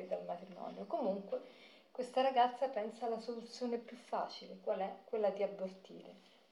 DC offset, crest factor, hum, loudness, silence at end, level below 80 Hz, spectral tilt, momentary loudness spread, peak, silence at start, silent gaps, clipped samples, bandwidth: under 0.1%; 20 dB; none; -40 LUFS; 0.35 s; under -90 dBFS; -5.5 dB/octave; 18 LU; -20 dBFS; 0 s; none; under 0.1%; 12 kHz